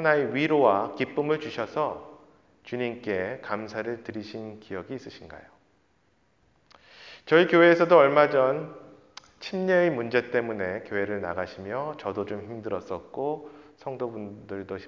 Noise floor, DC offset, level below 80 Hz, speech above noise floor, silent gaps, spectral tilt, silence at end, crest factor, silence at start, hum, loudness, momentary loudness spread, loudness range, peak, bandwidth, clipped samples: -67 dBFS; under 0.1%; -62 dBFS; 42 dB; none; -7 dB/octave; 0 s; 22 dB; 0 s; none; -25 LUFS; 21 LU; 13 LU; -4 dBFS; 7.2 kHz; under 0.1%